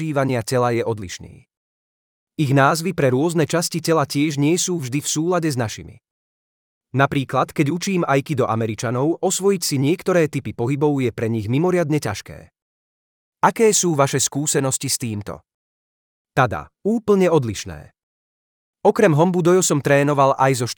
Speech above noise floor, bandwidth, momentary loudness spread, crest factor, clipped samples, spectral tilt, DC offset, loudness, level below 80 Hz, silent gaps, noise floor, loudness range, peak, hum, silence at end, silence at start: over 71 dB; 19.5 kHz; 11 LU; 18 dB; under 0.1%; -5 dB/octave; under 0.1%; -19 LUFS; -58 dBFS; 1.57-2.27 s, 6.11-6.81 s, 12.62-13.33 s, 15.54-16.25 s, 18.03-18.73 s; under -90 dBFS; 3 LU; -2 dBFS; none; 0.05 s; 0 s